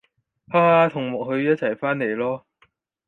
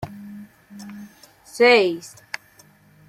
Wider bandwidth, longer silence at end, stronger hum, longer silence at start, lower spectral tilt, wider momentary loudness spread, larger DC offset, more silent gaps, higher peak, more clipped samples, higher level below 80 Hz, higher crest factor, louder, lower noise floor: second, 7.4 kHz vs 15 kHz; second, 0.7 s vs 1 s; neither; first, 0.5 s vs 0 s; first, -8.5 dB/octave vs -4 dB/octave; second, 10 LU vs 26 LU; neither; neither; about the same, -4 dBFS vs -2 dBFS; neither; second, -68 dBFS vs -62 dBFS; about the same, 18 dB vs 22 dB; second, -21 LUFS vs -17 LUFS; first, -63 dBFS vs -53 dBFS